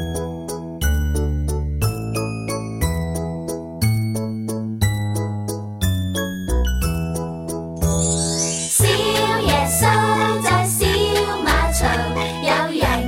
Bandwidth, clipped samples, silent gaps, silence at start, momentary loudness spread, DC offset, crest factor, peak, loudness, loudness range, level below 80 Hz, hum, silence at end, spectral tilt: 16.5 kHz; under 0.1%; none; 0 s; 10 LU; under 0.1%; 16 dB; -4 dBFS; -20 LUFS; 6 LU; -28 dBFS; none; 0 s; -4 dB/octave